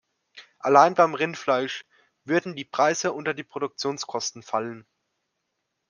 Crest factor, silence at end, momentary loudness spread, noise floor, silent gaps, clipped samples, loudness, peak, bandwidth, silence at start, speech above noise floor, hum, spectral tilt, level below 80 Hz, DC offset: 24 dB; 1.1 s; 14 LU; -79 dBFS; none; under 0.1%; -24 LUFS; -2 dBFS; 10.5 kHz; 0.35 s; 55 dB; none; -3.5 dB/octave; -78 dBFS; under 0.1%